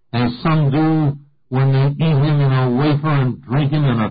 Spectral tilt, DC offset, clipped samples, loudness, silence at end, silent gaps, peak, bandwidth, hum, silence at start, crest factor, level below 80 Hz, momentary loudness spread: -13 dB/octave; under 0.1%; under 0.1%; -17 LUFS; 0 s; none; -8 dBFS; 5 kHz; none; 0.15 s; 8 dB; -44 dBFS; 5 LU